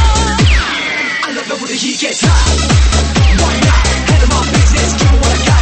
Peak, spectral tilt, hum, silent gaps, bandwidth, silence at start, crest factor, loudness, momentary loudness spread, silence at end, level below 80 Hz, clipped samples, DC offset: 0 dBFS; -4 dB/octave; none; none; 8.8 kHz; 0 s; 10 dB; -11 LUFS; 5 LU; 0 s; -14 dBFS; under 0.1%; 0.5%